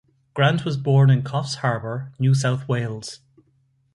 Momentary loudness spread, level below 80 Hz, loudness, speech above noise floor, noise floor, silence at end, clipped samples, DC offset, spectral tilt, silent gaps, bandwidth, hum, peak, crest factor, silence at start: 14 LU; -58 dBFS; -21 LUFS; 43 dB; -64 dBFS; 0.8 s; under 0.1%; under 0.1%; -6.5 dB/octave; none; 11.5 kHz; none; -4 dBFS; 16 dB; 0.35 s